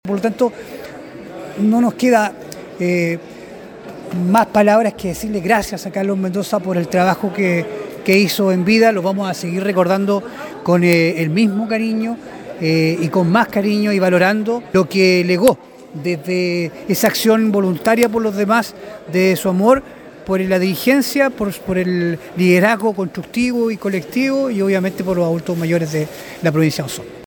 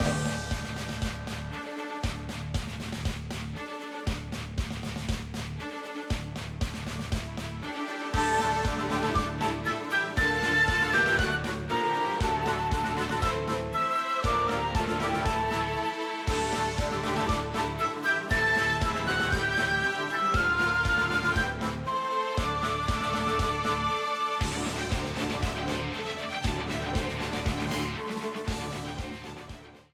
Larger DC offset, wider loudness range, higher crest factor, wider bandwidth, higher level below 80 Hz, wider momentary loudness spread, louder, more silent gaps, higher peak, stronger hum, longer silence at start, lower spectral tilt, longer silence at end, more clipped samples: neither; second, 3 LU vs 9 LU; about the same, 16 dB vs 16 dB; about the same, 19.5 kHz vs 18 kHz; second, -50 dBFS vs -40 dBFS; first, 14 LU vs 11 LU; first, -16 LUFS vs -29 LUFS; neither; first, 0 dBFS vs -14 dBFS; neither; about the same, 0.05 s vs 0 s; first, -6 dB/octave vs -4.5 dB/octave; second, 0 s vs 0.15 s; neither